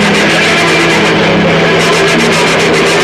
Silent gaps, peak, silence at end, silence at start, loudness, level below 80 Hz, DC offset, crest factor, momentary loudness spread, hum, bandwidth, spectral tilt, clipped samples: none; -2 dBFS; 0 s; 0 s; -7 LUFS; -38 dBFS; 0.4%; 6 dB; 1 LU; none; 15 kHz; -4 dB/octave; under 0.1%